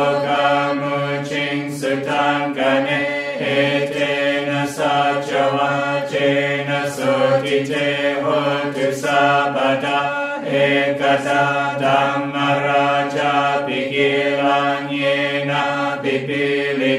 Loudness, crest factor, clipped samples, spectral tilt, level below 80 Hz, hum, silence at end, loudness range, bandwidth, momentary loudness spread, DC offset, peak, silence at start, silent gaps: -18 LUFS; 16 dB; under 0.1%; -5 dB/octave; -64 dBFS; none; 0 s; 1 LU; 14.5 kHz; 4 LU; under 0.1%; -2 dBFS; 0 s; none